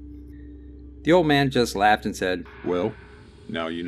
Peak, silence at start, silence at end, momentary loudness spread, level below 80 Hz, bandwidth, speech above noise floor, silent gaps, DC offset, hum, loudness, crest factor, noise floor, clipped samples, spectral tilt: -6 dBFS; 0 s; 0 s; 24 LU; -46 dBFS; 14.5 kHz; 20 dB; none; under 0.1%; none; -23 LUFS; 18 dB; -42 dBFS; under 0.1%; -5.5 dB/octave